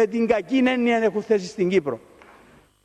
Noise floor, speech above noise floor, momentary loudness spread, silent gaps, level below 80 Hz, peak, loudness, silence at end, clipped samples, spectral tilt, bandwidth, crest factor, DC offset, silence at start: -53 dBFS; 32 dB; 5 LU; none; -60 dBFS; -6 dBFS; -22 LUFS; 0.85 s; under 0.1%; -6 dB/octave; 9.4 kHz; 16 dB; under 0.1%; 0 s